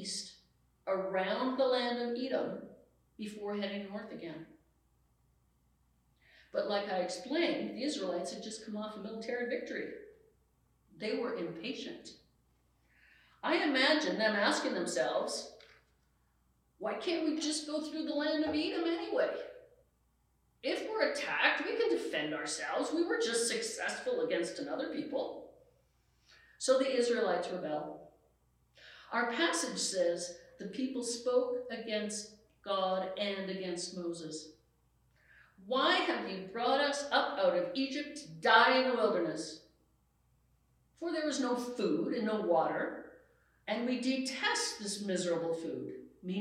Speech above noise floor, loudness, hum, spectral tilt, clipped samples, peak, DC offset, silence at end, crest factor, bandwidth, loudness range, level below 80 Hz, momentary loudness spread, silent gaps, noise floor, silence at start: 40 dB; -34 LUFS; none; -3 dB/octave; under 0.1%; -12 dBFS; under 0.1%; 0 s; 24 dB; 14 kHz; 9 LU; -76 dBFS; 14 LU; none; -74 dBFS; 0 s